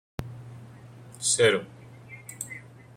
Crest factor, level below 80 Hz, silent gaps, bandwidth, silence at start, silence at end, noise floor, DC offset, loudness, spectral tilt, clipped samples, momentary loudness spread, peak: 24 dB; -60 dBFS; none; 16 kHz; 0.2 s; 0.3 s; -47 dBFS; under 0.1%; -25 LUFS; -2.5 dB/octave; under 0.1%; 26 LU; -8 dBFS